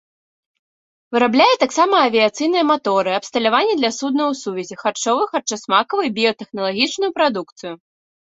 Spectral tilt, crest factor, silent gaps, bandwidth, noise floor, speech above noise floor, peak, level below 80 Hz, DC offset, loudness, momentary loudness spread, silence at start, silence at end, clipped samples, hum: -3 dB/octave; 18 dB; 7.52-7.56 s; 8.2 kHz; under -90 dBFS; over 72 dB; -2 dBFS; -66 dBFS; under 0.1%; -18 LUFS; 10 LU; 1.1 s; 0.5 s; under 0.1%; none